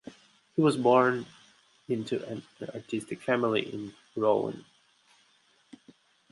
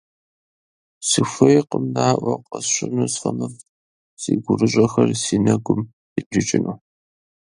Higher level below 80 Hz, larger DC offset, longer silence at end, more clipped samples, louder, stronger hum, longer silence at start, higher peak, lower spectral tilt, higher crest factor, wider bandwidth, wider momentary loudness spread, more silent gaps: second, -74 dBFS vs -54 dBFS; neither; first, 1.7 s vs 0.8 s; neither; second, -29 LUFS vs -20 LUFS; neither; second, 0.05 s vs 1 s; second, -10 dBFS vs 0 dBFS; about the same, -6 dB/octave vs -5 dB/octave; about the same, 20 dB vs 20 dB; about the same, 11.5 kHz vs 11.5 kHz; first, 18 LU vs 13 LU; second, none vs 3.69-4.17 s, 5.93-6.16 s, 6.26-6.31 s